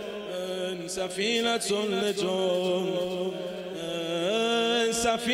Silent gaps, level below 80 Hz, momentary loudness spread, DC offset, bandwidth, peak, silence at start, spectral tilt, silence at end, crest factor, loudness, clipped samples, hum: none; -62 dBFS; 9 LU; under 0.1%; 16 kHz; -12 dBFS; 0 s; -3.5 dB/octave; 0 s; 16 dB; -28 LUFS; under 0.1%; none